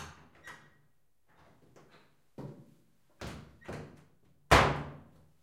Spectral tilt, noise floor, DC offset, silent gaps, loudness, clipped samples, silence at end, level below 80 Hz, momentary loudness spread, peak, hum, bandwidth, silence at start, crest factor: -4.5 dB/octave; -74 dBFS; under 0.1%; none; -27 LUFS; under 0.1%; 0.45 s; -46 dBFS; 28 LU; -8 dBFS; none; 16 kHz; 0 s; 28 dB